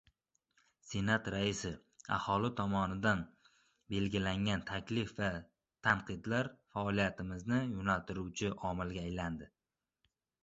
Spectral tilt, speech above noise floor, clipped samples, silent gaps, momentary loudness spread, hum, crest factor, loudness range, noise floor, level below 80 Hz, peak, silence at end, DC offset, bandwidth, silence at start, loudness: -5.5 dB/octave; over 54 dB; under 0.1%; none; 8 LU; none; 22 dB; 1 LU; under -90 dBFS; -56 dBFS; -14 dBFS; 0.95 s; under 0.1%; 8.2 kHz; 0.85 s; -37 LUFS